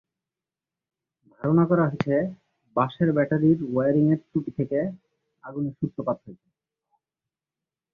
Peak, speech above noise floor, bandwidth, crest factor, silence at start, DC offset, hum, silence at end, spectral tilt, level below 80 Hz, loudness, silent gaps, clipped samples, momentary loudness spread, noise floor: -6 dBFS; 66 dB; 5 kHz; 20 dB; 1.4 s; under 0.1%; none; 1.6 s; -10.5 dB/octave; -62 dBFS; -24 LUFS; none; under 0.1%; 11 LU; -90 dBFS